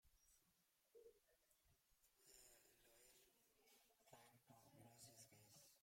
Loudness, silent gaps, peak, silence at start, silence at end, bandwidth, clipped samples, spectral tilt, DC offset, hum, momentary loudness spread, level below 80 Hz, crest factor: -67 LUFS; none; -52 dBFS; 0 s; 0 s; 16.5 kHz; under 0.1%; -2.5 dB/octave; under 0.1%; none; 4 LU; under -90 dBFS; 22 dB